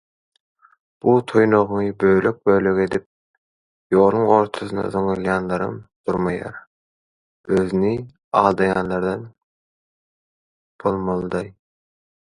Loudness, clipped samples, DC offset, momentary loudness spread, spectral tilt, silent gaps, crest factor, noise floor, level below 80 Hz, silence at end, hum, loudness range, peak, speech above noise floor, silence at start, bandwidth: -20 LUFS; under 0.1%; under 0.1%; 11 LU; -8 dB/octave; 3.06-3.90 s, 5.96-6.04 s, 6.67-7.44 s, 8.24-8.31 s, 9.43-10.79 s; 22 dB; under -90 dBFS; -50 dBFS; 0.7 s; none; 6 LU; 0 dBFS; over 71 dB; 1.05 s; 11 kHz